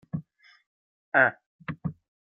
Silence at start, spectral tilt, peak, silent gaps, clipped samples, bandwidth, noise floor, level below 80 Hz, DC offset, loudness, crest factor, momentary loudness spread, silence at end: 0.15 s; -9.5 dB/octave; -6 dBFS; 0.66-1.12 s, 1.46-1.59 s; under 0.1%; 5.6 kHz; -46 dBFS; -64 dBFS; under 0.1%; -27 LUFS; 24 dB; 17 LU; 0.3 s